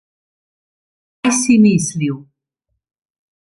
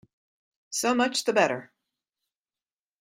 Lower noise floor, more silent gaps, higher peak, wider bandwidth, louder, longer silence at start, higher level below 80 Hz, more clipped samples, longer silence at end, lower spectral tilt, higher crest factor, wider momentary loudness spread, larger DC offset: second, -74 dBFS vs under -90 dBFS; neither; first, -2 dBFS vs -8 dBFS; second, 11.5 kHz vs 16 kHz; first, -15 LUFS vs -25 LUFS; first, 1.25 s vs 0.7 s; first, -56 dBFS vs -76 dBFS; neither; second, 1.2 s vs 1.35 s; first, -5 dB/octave vs -2.5 dB/octave; second, 16 dB vs 22 dB; about the same, 11 LU vs 9 LU; neither